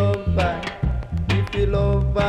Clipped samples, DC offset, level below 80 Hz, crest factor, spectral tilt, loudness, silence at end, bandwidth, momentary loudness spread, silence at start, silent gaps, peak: under 0.1%; under 0.1%; -26 dBFS; 14 dB; -7.5 dB/octave; -22 LUFS; 0 s; 9.6 kHz; 6 LU; 0 s; none; -6 dBFS